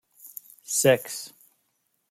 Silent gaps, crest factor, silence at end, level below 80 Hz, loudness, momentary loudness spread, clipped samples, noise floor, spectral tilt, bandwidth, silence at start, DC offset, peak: none; 22 dB; 0.85 s; -72 dBFS; -24 LUFS; 22 LU; under 0.1%; -74 dBFS; -3 dB/octave; 16.5 kHz; 0.25 s; under 0.1%; -6 dBFS